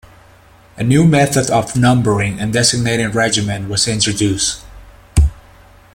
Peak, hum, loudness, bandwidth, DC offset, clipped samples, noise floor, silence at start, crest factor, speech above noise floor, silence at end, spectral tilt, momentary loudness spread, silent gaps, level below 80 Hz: 0 dBFS; none; -15 LUFS; 16.5 kHz; under 0.1%; under 0.1%; -45 dBFS; 0.75 s; 16 dB; 31 dB; 0.55 s; -4.5 dB/octave; 7 LU; none; -28 dBFS